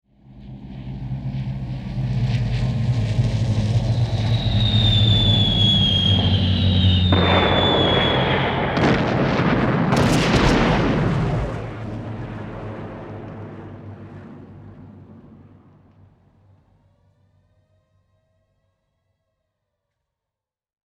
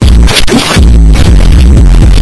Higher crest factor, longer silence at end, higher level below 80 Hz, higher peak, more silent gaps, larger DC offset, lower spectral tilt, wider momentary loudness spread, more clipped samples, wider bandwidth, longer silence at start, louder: first, 18 dB vs 2 dB; first, 5.65 s vs 0 s; second, -34 dBFS vs -4 dBFS; second, -4 dBFS vs 0 dBFS; neither; neither; about the same, -6 dB/octave vs -5.5 dB/octave; first, 20 LU vs 1 LU; second, under 0.1% vs 30%; about the same, 11 kHz vs 11 kHz; first, 0.35 s vs 0 s; second, -19 LUFS vs -5 LUFS